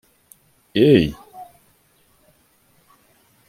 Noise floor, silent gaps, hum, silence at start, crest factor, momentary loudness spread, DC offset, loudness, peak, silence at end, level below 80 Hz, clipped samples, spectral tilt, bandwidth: -59 dBFS; none; none; 0.75 s; 20 dB; 28 LU; under 0.1%; -17 LUFS; -2 dBFS; 2.05 s; -48 dBFS; under 0.1%; -7.5 dB/octave; 16 kHz